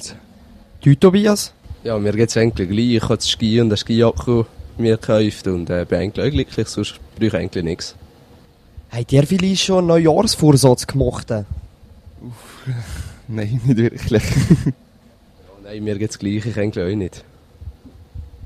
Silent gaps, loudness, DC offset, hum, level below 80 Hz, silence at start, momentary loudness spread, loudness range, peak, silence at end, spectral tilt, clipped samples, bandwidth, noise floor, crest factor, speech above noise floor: none; -18 LUFS; under 0.1%; none; -38 dBFS; 0 s; 18 LU; 7 LU; 0 dBFS; 0 s; -6 dB/octave; under 0.1%; 14.5 kHz; -49 dBFS; 18 dB; 32 dB